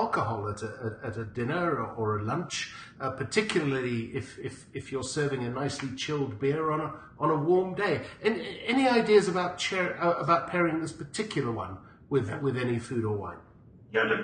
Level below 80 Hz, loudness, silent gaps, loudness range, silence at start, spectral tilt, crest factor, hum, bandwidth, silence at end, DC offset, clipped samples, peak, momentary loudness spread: -58 dBFS; -29 LUFS; none; 5 LU; 0 s; -5.5 dB/octave; 20 dB; none; 9.8 kHz; 0 s; under 0.1%; under 0.1%; -10 dBFS; 12 LU